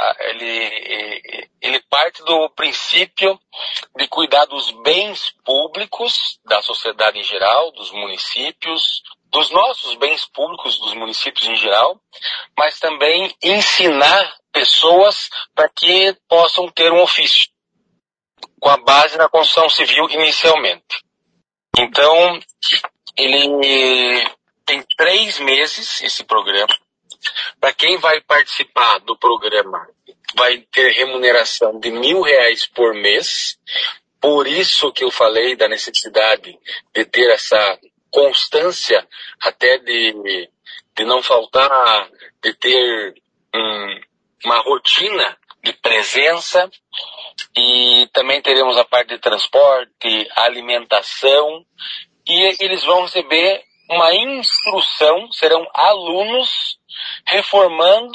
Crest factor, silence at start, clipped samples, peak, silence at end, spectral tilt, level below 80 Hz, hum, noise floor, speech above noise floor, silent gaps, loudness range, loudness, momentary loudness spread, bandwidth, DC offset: 16 dB; 0 s; under 0.1%; 0 dBFS; 0 s; -1.5 dB/octave; -64 dBFS; none; -71 dBFS; 56 dB; none; 4 LU; -14 LUFS; 12 LU; 9.6 kHz; under 0.1%